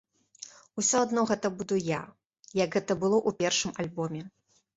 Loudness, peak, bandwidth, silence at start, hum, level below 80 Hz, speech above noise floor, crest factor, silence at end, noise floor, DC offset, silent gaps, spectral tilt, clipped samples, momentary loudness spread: -29 LUFS; -12 dBFS; 8.2 kHz; 0.4 s; none; -66 dBFS; 22 dB; 18 dB; 0.45 s; -50 dBFS; under 0.1%; 2.26-2.30 s; -3.5 dB/octave; under 0.1%; 20 LU